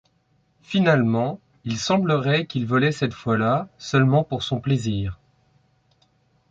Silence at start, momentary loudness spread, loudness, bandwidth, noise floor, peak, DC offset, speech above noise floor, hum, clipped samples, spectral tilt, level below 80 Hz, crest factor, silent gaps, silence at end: 0.7 s; 9 LU; -22 LUFS; 7.8 kHz; -65 dBFS; -6 dBFS; under 0.1%; 44 dB; none; under 0.1%; -6.5 dB/octave; -50 dBFS; 18 dB; none; 1.35 s